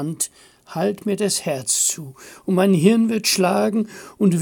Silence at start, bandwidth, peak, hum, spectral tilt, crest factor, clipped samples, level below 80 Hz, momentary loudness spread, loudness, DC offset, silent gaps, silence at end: 0 s; 17 kHz; -2 dBFS; none; -4.5 dB/octave; 18 dB; under 0.1%; -66 dBFS; 15 LU; -19 LUFS; under 0.1%; none; 0 s